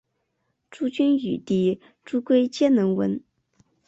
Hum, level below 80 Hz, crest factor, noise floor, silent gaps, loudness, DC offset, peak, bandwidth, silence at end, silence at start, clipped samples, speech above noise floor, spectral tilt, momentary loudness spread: none; -64 dBFS; 16 dB; -75 dBFS; none; -23 LUFS; under 0.1%; -8 dBFS; 8 kHz; 0.7 s; 0.8 s; under 0.1%; 53 dB; -7 dB/octave; 10 LU